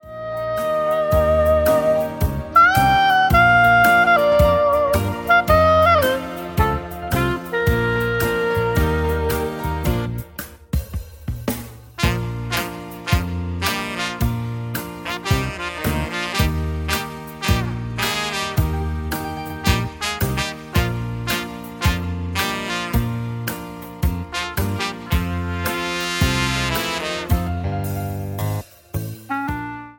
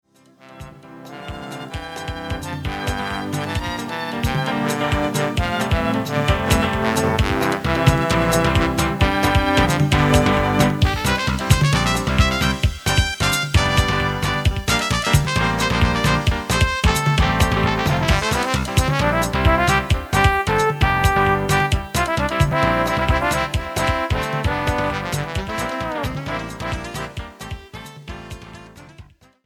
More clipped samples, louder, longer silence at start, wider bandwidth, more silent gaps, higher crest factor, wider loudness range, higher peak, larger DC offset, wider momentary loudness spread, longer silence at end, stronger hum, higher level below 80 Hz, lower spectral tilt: neither; about the same, -20 LUFS vs -19 LUFS; second, 0.05 s vs 0.45 s; second, 17 kHz vs 20 kHz; neither; about the same, 18 dB vs 20 dB; about the same, 10 LU vs 9 LU; about the same, -2 dBFS vs 0 dBFS; neither; about the same, 13 LU vs 13 LU; second, 0.05 s vs 0.4 s; neither; about the same, -30 dBFS vs -28 dBFS; about the same, -5 dB/octave vs -5 dB/octave